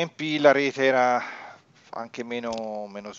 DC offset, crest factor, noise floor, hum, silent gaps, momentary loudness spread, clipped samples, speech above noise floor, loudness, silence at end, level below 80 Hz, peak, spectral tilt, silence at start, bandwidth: under 0.1%; 22 dB; -48 dBFS; none; none; 18 LU; under 0.1%; 24 dB; -23 LUFS; 0 s; -70 dBFS; -4 dBFS; -4.5 dB/octave; 0 s; 7.6 kHz